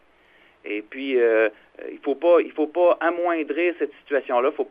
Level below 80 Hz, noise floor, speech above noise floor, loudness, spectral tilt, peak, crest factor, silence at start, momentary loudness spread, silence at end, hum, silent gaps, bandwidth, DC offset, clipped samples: -72 dBFS; -56 dBFS; 34 dB; -22 LUFS; -6.5 dB/octave; -6 dBFS; 16 dB; 0.65 s; 13 LU; 0 s; none; none; 4.9 kHz; under 0.1%; under 0.1%